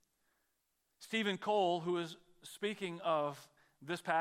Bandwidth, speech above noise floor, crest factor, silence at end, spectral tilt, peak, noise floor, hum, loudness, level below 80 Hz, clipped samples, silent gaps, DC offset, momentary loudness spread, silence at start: 16 kHz; 46 dB; 20 dB; 0 s; -5 dB/octave; -18 dBFS; -82 dBFS; none; -37 LUFS; -86 dBFS; under 0.1%; none; under 0.1%; 20 LU; 1 s